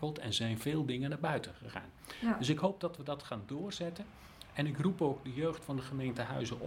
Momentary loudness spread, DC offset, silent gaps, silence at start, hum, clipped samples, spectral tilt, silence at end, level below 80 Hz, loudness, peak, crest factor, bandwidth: 13 LU; under 0.1%; none; 0 s; none; under 0.1%; -5.5 dB/octave; 0 s; -64 dBFS; -37 LUFS; -18 dBFS; 20 dB; 16.5 kHz